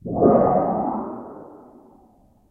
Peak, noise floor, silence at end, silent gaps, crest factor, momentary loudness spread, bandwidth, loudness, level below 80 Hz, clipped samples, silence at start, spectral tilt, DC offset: -2 dBFS; -55 dBFS; 0.95 s; none; 20 dB; 22 LU; 2.6 kHz; -20 LUFS; -50 dBFS; under 0.1%; 0.05 s; -13 dB/octave; under 0.1%